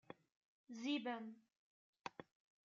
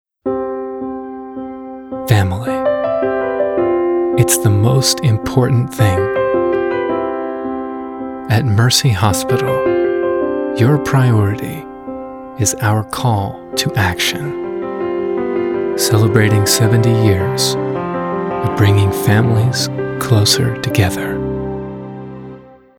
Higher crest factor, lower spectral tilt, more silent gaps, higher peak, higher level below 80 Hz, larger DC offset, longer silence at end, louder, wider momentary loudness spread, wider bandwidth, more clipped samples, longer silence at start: first, 22 dB vs 16 dB; second, -2 dB/octave vs -5 dB/octave; first, 0.36-0.64 s, 1.57-1.93 s vs none; second, -28 dBFS vs 0 dBFS; second, under -90 dBFS vs -42 dBFS; neither; first, 0.45 s vs 0.3 s; second, -48 LUFS vs -15 LUFS; first, 19 LU vs 14 LU; second, 7.2 kHz vs 18 kHz; neither; second, 0.1 s vs 0.25 s